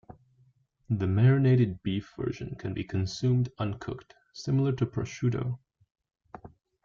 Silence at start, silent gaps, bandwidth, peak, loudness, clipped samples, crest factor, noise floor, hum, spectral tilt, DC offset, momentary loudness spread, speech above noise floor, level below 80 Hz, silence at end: 0.9 s; none; 7.2 kHz; -12 dBFS; -29 LUFS; under 0.1%; 18 dB; -66 dBFS; none; -7.5 dB/octave; under 0.1%; 18 LU; 38 dB; -56 dBFS; 0.35 s